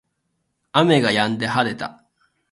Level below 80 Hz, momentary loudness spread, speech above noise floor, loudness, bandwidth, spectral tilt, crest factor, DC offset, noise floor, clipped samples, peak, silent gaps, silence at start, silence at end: -60 dBFS; 12 LU; 54 dB; -19 LUFS; 11.5 kHz; -5.5 dB/octave; 22 dB; under 0.1%; -73 dBFS; under 0.1%; 0 dBFS; none; 0.75 s; 0.6 s